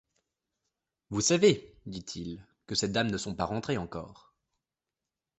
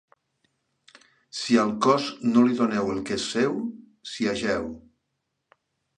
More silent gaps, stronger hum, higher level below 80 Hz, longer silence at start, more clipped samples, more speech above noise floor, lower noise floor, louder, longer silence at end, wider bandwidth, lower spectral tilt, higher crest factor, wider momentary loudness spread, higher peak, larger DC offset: neither; neither; about the same, -58 dBFS vs -60 dBFS; second, 1.1 s vs 1.35 s; neither; first, 60 dB vs 55 dB; first, -90 dBFS vs -79 dBFS; second, -30 LUFS vs -24 LUFS; about the same, 1.25 s vs 1.2 s; second, 8.6 kHz vs 10 kHz; about the same, -4 dB/octave vs -4.5 dB/octave; about the same, 22 dB vs 20 dB; about the same, 19 LU vs 17 LU; second, -10 dBFS vs -6 dBFS; neither